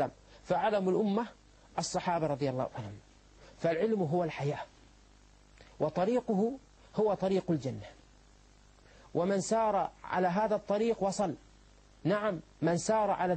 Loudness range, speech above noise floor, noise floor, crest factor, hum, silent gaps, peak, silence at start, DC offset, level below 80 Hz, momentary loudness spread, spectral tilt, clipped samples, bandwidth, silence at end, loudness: 3 LU; 29 dB; -60 dBFS; 16 dB; 50 Hz at -60 dBFS; none; -16 dBFS; 0 s; under 0.1%; -62 dBFS; 11 LU; -6 dB/octave; under 0.1%; 8.8 kHz; 0 s; -32 LUFS